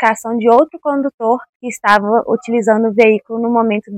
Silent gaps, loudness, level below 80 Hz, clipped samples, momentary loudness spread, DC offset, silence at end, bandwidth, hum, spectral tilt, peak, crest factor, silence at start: 1.14-1.18 s, 1.49-1.60 s; -14 LUFS; -60 dBFS; 0.3%; 7 LU; under 0.1%; 0 s; 14.5 kHz; none; -5.5 dB/octave; 0 dBFS; 14 dB; 0 s